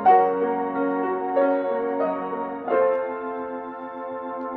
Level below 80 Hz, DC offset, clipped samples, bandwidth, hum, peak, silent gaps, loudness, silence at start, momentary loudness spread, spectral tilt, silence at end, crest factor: -66 dBFS; under 0.1%; under 0.1%; 4.5 kHz; none; -6 dBFS; none; -24 LUFS; 0 s; 11 LU; -9 dB/octave; 0 s; 16 dB